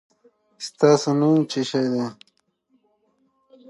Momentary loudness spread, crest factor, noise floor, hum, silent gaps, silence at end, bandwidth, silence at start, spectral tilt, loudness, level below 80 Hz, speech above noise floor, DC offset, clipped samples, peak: 15 LU; 20 dB; -67 dBFS; none; none; 1.55 s; 11.5 kHz; 0.6 s; -6 dB/octave; -20 LUFS; -76 dBFS; 47 dB; under 0.1%; under 0.1%; -4 dBFS